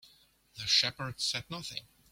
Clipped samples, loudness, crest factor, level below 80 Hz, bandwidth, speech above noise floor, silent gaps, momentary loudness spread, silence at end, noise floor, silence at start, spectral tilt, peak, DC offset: under 0.1%; -31 LUFS; 24 dB; -66 dBFS; 16.5 kHz; 31 dB; none; 16 LU; 0.3 s; -64 dBFS; 0.05 s; -1.5 dB/octave; -12 dBFS; under 0.1%